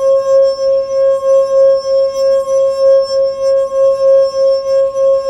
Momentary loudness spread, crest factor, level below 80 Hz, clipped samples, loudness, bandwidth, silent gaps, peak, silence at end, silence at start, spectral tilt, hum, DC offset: 4 LU; 8 dB; -50 dBFS; under 0.1%; -11 LUFS; 9.2 kHz; none; -2 dBFS; 0 s; 0 s; -3 dB/octave; none; under 0.1%